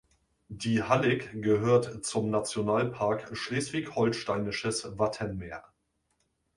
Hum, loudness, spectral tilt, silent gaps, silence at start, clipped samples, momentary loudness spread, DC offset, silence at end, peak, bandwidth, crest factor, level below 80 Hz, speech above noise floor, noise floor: none; -29 LUFS; -5 dB/octave; none; 0.5 s; under 0.1%; 10 LU; under 0.1%; 0.95 s; -10 dBFS; 11.5 kHz; 20 dB; -58 dBFS; 47 dB; -76 dBFS